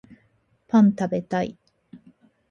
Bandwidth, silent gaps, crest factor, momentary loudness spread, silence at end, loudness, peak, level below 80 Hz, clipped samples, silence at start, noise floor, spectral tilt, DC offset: 7 kHz; none; 18 dB; 9 LU; 0.55 s; -22 LUFS; -6 dBFS; -64 dBFS; under 0.1%; 0.75 s; -65 dBFS; -8 dB/octave; under 0.1%